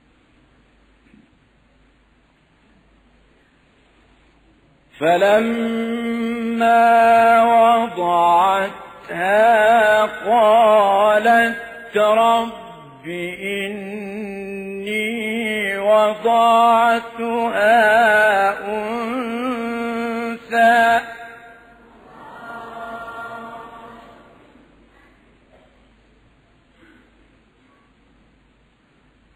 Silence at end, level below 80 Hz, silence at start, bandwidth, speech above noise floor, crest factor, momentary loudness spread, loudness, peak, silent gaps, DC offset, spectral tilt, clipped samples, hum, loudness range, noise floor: 5.35 s; -58 dBFS; 5 s; 15.5 kHz; 41 dB; 14 dB; 19 LU; -16 LUFS; -4 dBFS; none; under 0.1%; -4.5 dB/octave; under 0.1%; none; 17 LU; -57 dBFS